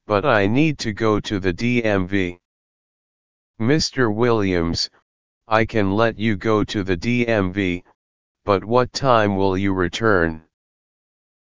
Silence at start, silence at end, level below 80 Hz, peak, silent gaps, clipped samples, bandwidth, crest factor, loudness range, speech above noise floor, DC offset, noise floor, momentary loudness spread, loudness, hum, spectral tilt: 0 s; 0.9 s; -40 dBFS; 0 dBFS; 2.45-3.54 s, 5.02-5.41 s, 7.95-8.35 s; under 0.1%; 7.6 kHz; 20 dB; 2 LU; over 71 dB; 2%; under -90 dBFS; 7 LU; -20 LUFS; none; -6 dB/octave